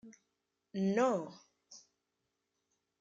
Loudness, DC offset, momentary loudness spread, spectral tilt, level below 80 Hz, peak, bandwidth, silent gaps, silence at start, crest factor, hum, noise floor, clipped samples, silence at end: -34 LUFS; under 0.1%; 25 LU; -6.5 dB/octave; -86 dBFS; -20 dBFS; 7.8 kHz; none; 0.05 s; 20 dB; none; -86 dBFS; under 0.1%; 1.2 s